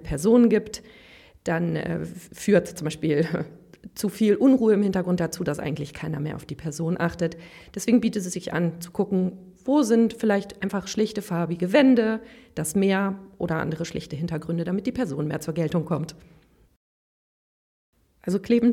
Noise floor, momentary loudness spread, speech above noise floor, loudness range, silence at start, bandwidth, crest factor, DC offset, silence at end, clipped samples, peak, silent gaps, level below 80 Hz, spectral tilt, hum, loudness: under -90 dBFS; 13 LU; over 66 dB; 6 LU; 0 s; 16 kHz; 18 dB; under 0.1%; 0 s; under 0.1%; -6 dBFS; 16.76-17.93 s; -52 dBFS; -6.5 dB/octave; none; -24 LUFS